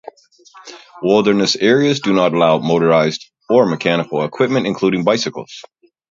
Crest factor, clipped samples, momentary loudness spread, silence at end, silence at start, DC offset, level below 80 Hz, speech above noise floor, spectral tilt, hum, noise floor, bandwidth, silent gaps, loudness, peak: 16 dB; under 0.1%; 10 LU; 0.5 s; 0.55 s; under 0.1%; -58 dBFS; 24 dB; -5.5 dB/octave; none; -39 dBFS; 7.6 kHz; none; -15 LUFS; 0 dBFS